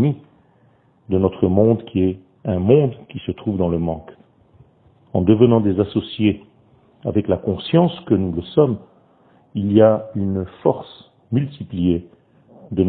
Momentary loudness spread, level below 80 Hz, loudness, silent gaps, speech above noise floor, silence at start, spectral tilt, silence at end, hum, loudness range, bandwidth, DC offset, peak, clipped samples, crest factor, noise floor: 15 LU; -48 dBFS; -19 LUFS; none; 38 dB; 0 s; -12.5 dB/octave; 0 s; none; 2 LU; 4.4 kHz; under 0.1%; 0 dBFS; under 0.1%; 20 dB; -56 dBFS